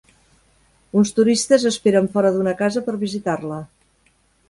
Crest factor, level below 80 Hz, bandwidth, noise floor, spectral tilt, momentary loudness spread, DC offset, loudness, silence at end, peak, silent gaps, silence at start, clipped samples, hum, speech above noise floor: 18 dB; -58 dBFS; 11.5 kHz; -61 dBFS; -5 dB/octave; 9 LU; under 0.1%; -19 LUFS; 0.85 s; -2 dBFS; none; 0.95 s; under 0.1%; none; 42 dB